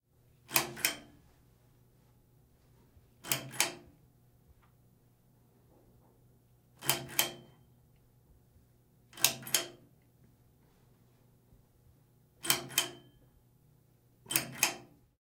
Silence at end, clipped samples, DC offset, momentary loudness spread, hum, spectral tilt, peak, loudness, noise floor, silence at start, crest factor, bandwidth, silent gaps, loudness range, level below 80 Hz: 0.35 s; under 0.1%; under 0.1%; 19 LU; none; -0.5 dB/octave; -4 dBFS; -32 LUFS; -66 dBFS; 0.5 s; 36 dB; 17.5 kHz; none; 5 LU; -72 dBFS